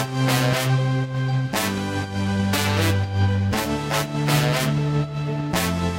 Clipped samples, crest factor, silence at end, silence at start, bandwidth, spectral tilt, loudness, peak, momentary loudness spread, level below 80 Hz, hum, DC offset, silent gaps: under 0.1%; 16 dB; 0 s; 0 s; 16 kHz; -5 dB/octave; -22 LUFS; -6 dBFS; 5 LU; -44 dBFS; none; under 0.1%; none